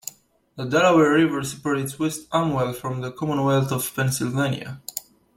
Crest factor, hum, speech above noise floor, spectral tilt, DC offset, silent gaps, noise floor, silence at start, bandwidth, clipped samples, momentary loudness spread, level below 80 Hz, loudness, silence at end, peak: 16 dB; none; 20 dB; -5.5 dB/octave; under 0.1%; none; -42 dBFS; 0.05 s; 16.5 kHz; under 0.1%; 16 LU; -58 dBFS; -22 LUFS; 0.35 s; -6 dBFS